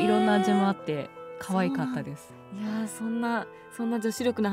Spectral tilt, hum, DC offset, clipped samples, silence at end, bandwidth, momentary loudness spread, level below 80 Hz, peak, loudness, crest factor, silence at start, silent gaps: -6 dB/octave; none; under 0.1%; under 0.1%; 0 s; 16 kHz; 17 LU; -70 dBFS; -12 dBFS; -28 LUFS; 16 dB; 0 s; none